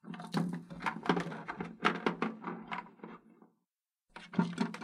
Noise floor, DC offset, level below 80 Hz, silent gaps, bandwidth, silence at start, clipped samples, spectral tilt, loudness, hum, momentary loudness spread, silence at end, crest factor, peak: -89 dBFS; under 0.1%; -72 dBFS; none; 11.5 kHz; 0.05 s; under 0.1%; -6 dB/octave; -37 LUFS; none; 18 LU; 0 s; 26 dB; -12 dBFS